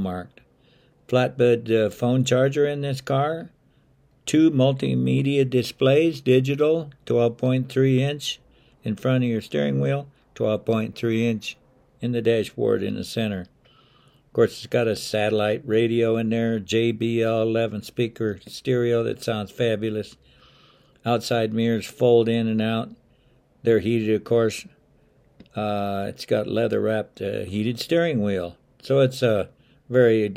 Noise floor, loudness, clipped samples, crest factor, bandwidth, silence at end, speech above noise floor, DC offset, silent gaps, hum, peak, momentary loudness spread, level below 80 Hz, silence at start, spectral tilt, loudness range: -59 dBFS; -23 LUFS; under 0.1%; 18 dB; 15.5 kHz; 0 s; 38 dB; under 0.1%; none; none; -4 dBFS; 10 LU; -60 dBFS; 0 s; -6.5 dB/octave; 5 LU